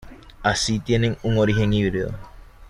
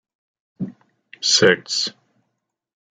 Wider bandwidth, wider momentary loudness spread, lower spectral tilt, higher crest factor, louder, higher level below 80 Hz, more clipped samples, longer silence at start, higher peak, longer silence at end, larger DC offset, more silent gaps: first, 11.5 kHz vs 9.6 kHz; second, 9 LU vs 18 LU; first, -5.5 dB/octave vs -2 dB/octave; second, 16 dB vs 22 dB; second, -22 LUFS vs -17 LUFS; first, -38 dBFS vs -68 dBFS; neither; second, 0.05 s vs 0.6 s; second, -6 dBFS vs -2 dBFS; second, 0 s vs 1.05 s; neither; neither